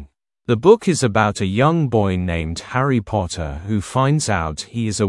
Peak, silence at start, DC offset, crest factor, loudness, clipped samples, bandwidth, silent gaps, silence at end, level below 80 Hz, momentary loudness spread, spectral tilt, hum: 0 dBFS; 0 s; under 0.1%; 18 dB; -19 LUFS; under 0.1%; 12 kHz; none; 0 s; -42 dBFS; 10 LU; -6 dB/octave; none